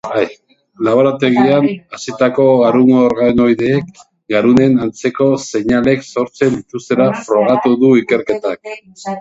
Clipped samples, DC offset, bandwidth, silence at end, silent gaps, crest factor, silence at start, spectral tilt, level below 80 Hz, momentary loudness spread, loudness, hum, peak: under 0.1%; under 0.1%; 8 kHz; 0 s; none; 12 dB; 0.05 s; -6.5 dB/octave; -48 dBFS; 12 LU; -13 LUFS; none; 0 dBFS